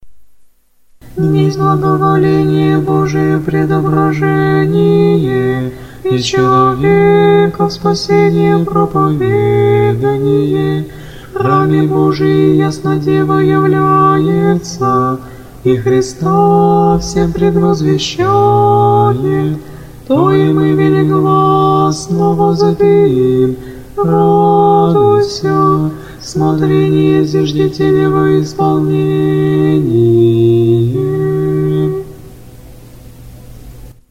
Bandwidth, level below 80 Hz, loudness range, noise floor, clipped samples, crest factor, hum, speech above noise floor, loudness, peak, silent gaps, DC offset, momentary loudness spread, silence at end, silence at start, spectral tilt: 15 kHz; -38 dBFS; 2 LU; -47 dBFS; under 0.1%; 10 dB; none; 37 dB; -11 LUFS; 0 dBFS; none; under 0.1%; 6 LU; 0.2 s; 0.05 s; -7.5 dB/octave